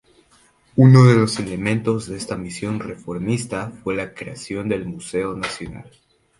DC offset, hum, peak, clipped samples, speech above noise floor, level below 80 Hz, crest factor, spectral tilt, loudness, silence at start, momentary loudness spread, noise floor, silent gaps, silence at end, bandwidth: under 0.1%; none; 0 dBFS; under 0.1%; 37 dB; -50 dBFS; 20 dB; -7 dB/octave; -20 LUFS; 0.75 s; 18 LU; -56 dBFS; none; 0.5 s; 11.5 kHz